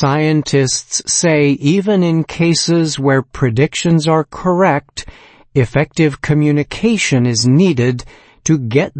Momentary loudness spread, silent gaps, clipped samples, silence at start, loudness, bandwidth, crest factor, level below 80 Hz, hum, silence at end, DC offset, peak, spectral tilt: 5 LU; none; under 0.1%; 0 s; -14 LUFS; 8.8 kHz; 14 dB; -42 dBFS; none; 0 s; under 0.1%; 0 dBFS; -5 dB/octave